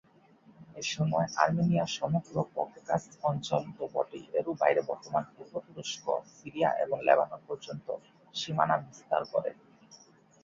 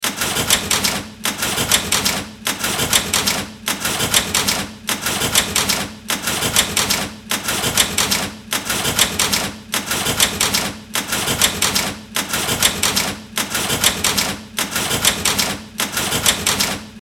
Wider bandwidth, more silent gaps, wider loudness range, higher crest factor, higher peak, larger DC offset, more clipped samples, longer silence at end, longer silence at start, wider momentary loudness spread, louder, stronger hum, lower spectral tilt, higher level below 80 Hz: second, 7.6 kHz vs 19 kHz; neither; about the same, 2 LU vs 1 LU; about the same, 24 dB vs 20 dB; second, -8 dBFS vs 0 dBFS; neither; neither; first, 0.5 s vs 0.05 s; first, 0.6 s vs 0 s; first, 13 LU vs 7 LU; second, -31 LUFS vs -17 LUFS; neither; first, -5.5 dB/octave vs -1 dB/octave; second, -68 dBFS vs -42 dBFS